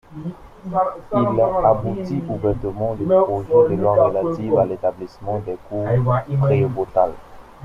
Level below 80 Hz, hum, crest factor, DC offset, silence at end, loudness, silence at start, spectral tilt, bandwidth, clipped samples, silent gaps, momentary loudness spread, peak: -44 dBFS; none; 18 dB; under 0.1%; 0 s; -19 LUFS; 0.1 s; -10 dB/octave; 6.8 kHz; under 0.1%; none; 10 LU; -2 dBFS